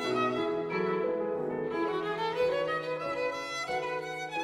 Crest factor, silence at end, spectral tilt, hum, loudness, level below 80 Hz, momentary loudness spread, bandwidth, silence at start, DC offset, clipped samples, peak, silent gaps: 14 dB; 0 s; -5 dB/octave; none; -32 LUFS; -66 dBFS; 4 LU; 15.5 kHz; 0 s; under 0.1%; under 0.1%; -18 dBFS; none